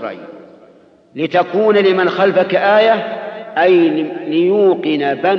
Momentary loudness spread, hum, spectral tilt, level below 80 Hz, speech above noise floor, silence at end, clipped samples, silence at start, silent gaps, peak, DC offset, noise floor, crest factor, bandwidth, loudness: 13 LU; none; -7.5 dB/octave; -68 dBFS; 33 dB; 0 s; under 0.1%; 0 s; none; -2 dBFS; under 0.1%; -46 dBFS; 12 dB; 6.2 kHz; -14 LUFS